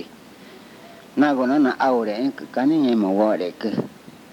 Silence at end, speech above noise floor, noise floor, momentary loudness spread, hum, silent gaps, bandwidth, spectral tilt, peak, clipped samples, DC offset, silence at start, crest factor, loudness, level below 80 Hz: 0.25 s; 24 dB; -44 dBFS; 10 LU; none; none; 16.5 kHz; -7 dB/octave; -6 dBFS; under 0.1%; under 0.1%; 0 s; 16 dB; -21 LUFS; -70 dBFS